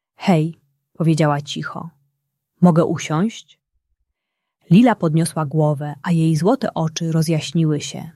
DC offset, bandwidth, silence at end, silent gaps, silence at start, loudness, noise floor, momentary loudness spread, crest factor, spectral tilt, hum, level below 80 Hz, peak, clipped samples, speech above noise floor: under 0.1%; 12.5 kHz; 0.05 s; none; 0.2 s; -18 LUFS; -79 dBFS; 11 LU; 18 dB; -6.5 dB/octave; none; -60 dBFS; -2 dBFS; under 0.1%; 62 dB